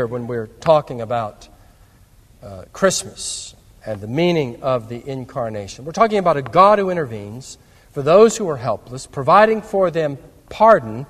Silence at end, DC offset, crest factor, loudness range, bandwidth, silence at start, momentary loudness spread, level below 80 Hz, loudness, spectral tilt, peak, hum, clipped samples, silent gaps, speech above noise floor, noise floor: 0.05 s; under 0.1%; 18 dB; 7 LU; 14.5 kHz; 0 s; 20 LU; -50 dBFS; -17 LUFS; -5 dB/octave; 0 dBFS; none; under 0.1%; none; 32 dB; -49 dBFS